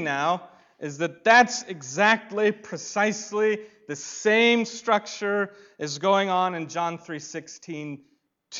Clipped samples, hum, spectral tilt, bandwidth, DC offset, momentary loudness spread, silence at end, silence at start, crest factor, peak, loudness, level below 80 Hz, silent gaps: under 0.1%; none; -3.5 dB/octave; 7.8 kHz; under 0.1%; 17 LU; 0 s; 0 s; 20 dB; -6 dBFS; -23 LUFS; -74 dBFS; none